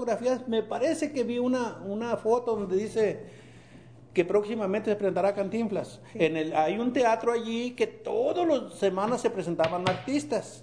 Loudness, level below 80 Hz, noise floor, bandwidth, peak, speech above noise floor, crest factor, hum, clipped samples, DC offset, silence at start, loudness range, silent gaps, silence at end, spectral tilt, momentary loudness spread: -28 LUFS; -64 dBFS; -51 dBFS; 10 kHz; -10 dBFS; 23 dB; 18 dB; none; under 0.1%; under 0.1%; 0 s; 2 LU; none; 0 s; -5.5 dB/octave; 5 LU